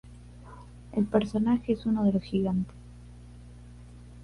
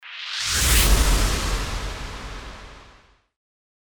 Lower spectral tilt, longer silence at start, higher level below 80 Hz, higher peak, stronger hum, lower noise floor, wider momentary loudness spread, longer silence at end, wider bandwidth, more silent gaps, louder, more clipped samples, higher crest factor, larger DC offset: first, -8.5 dB/octave vs -2.5 dB/octave; about the same, 0.05 s vs 0.05 s; second, -50 dBFS vs -26 dBFS; second, -10 dBFS vs -4 dBFS; first, 60 Hz at -45 dBFS vs none; second, -47 dBFS vs -53 dBFS; first, 23 LU vs 20 LU; second, 0 s vs 1 s; second, 11 kHz vs over 20 kHz; neither; second, -28 LUFS vs -21 LUFS; neither; about the same, 20 dB vs 18 dB; neither